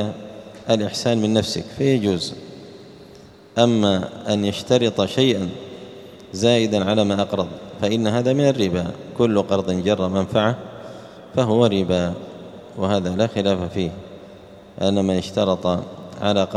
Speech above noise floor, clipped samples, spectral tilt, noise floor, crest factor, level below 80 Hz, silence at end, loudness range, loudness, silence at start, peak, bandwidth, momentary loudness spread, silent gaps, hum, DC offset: 25 dB; under 0.1%; -6 dB/octave; -44 dBFS; 20 dB; -52 dBFS; 0 s; 2 LU; -21 LUFS; 0 s; -2 dBFS; 12.5 kHz; 19 LU; none; none; under 0.1%